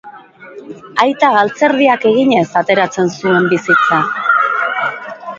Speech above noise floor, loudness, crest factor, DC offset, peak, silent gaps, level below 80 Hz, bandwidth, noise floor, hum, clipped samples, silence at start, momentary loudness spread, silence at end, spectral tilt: 23 dB; -13 LUFS; 14 dB; under 0.1%; 0 dBFS; none; -58 dBFS; 7.8 kHz; -36 dBFS; none; under 0.1%; 0.05 s; 9 LU; 0 s; -5.5 dB/octave